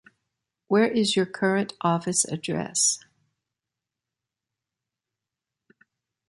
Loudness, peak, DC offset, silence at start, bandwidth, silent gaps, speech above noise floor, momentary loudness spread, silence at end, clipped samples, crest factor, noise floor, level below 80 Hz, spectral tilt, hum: -24 LUFS; -8 dBFS; under 0.1%; 0.7 s; 11.5 kHz; none; 64 dB; 5 LU; 3.3 s; under 0.1%; 20 dB; -88 dBFS; -70 dBFS; -3.5 dB/octave; none